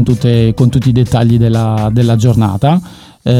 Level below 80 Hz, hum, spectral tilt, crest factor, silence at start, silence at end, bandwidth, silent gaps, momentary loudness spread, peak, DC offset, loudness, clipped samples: -32 dBFS; none; -8 dB/octave; 10 dB; 0 s; 0 s; 11.5 kHz; none; 3 LU; 0 dBFS; under 0.1%; -11 LUFS; under 0.1%